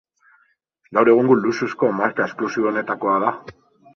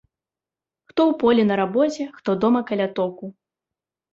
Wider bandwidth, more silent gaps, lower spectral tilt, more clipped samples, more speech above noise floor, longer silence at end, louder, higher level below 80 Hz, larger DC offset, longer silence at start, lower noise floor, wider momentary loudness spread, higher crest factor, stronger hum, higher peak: second, 6.8 kHz vs 7.8 kHz; neither; about the same, -7 dB/octave vs -6.5 dB/octave; neither; second, 44 dB vs 70 dB; second, 0.45 s vs 0.8 s; about the same, -19 LUFS vs -21 LUFS; about the same, -64 dBFS vs -62 dBFS; neither; about the same, 0.9 s vs 0.95 s; second, -63 dBFS vs -90 dBFS; second, 8 LU vs 11 LU; about the same, 18 dB vs 18 dB; neither; first, -2 dBFS vs -6 dBFS